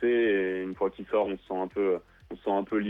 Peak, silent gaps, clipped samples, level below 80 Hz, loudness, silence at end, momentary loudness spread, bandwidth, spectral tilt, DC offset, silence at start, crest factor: -14 dBFS; none; under 0.1%; -60 dBFS; -29 LUFS; 0 s; 8 LU; 4 kHz; -8 dB/octave; under 0.1%; 0 s; 14 dB